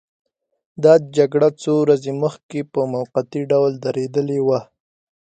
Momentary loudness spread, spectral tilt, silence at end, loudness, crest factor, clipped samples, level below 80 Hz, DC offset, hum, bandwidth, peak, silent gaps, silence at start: 9 LU; -7 dB/octave; 0.7 s; -18 LUFS; 18 dB; under 0.1%; -66 dBFS; under 0.1%; none; 9 kHz; -2 dBFS; 2.43-2.49 s; 0.8 s